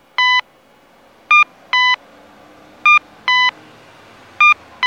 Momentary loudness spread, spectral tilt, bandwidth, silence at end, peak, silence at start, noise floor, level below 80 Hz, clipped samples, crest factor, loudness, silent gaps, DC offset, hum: 5 LU; 1 dB/octave; 8.6 kHz; 0 s; -2 dBFS; 0.2 s; -50 dBFS; -66 dBFS; under 0.1%; 16 dB; -13 LUFS; none; under 0.1%; none